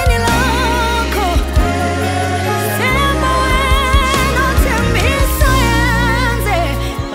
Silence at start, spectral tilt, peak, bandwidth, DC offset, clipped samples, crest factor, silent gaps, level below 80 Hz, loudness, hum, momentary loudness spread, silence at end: 0 s; -4.5 dB/octave; 0 dBFS; 16.5 kHz; under 0.1%; under 0.1%; 14 dB; none; -18 dBFS; -14 LUFS; none; 4 LU; 0 s